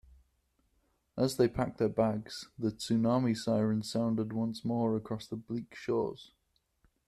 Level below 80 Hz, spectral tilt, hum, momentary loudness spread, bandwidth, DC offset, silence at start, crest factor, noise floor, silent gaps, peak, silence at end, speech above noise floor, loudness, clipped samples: -62 dBFS; -6.5 dB/octave; none; 10 LU; 13.5 kHz; under 0.1%; 1.15 s; 20 dB; -75 dBFS; none; -14 dBFS; 0.85 s; 43 dB; -33 LUFS; under 0.1%